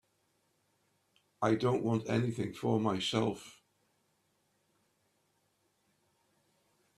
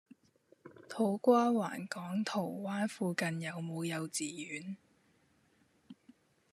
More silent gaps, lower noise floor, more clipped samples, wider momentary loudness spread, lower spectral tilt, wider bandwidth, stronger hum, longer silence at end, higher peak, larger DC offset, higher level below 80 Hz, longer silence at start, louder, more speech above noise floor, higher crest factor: neither; first, -76 dBFS vs -71 dBFS; neither; second, 5 LU vs 14 LU; about the same, -6 dB/octave vs -5 dB/octave; about the same, 13 kHz vs 14 kHz; neither; first, 3.45 s vs 0.6 s; about the same, -16 dBFS vs -14 dBFS; neither; first, -72 dBFS vs -86 dBFS; first, 1.4 s vs 0.65 s; about the same, -33 LUFS vs -35 LUFS; first, 44 dB vs 37 dB; about the same, 22 dB vs 22 dB